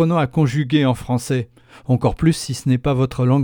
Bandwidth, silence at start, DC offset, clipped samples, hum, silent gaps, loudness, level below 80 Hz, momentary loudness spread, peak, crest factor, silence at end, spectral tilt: 17.5 kHz; 0 s; under 0.1%; under 0.1%; none; none; -19 LUFS; -40 dBFS; 6 LU; -4 dBFS; 14 dB; 0 s; -7 dB/octave